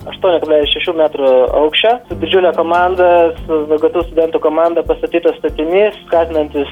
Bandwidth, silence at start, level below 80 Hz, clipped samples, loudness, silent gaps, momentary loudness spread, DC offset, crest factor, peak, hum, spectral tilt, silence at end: 5.4 kHz; 0 s; -36 dBFS; under 0.1%; -13 LUFS; none; 5 LU; under 0.1%; 12 dB; 0 dBFS; none; -6.5 dB/octave; 0 s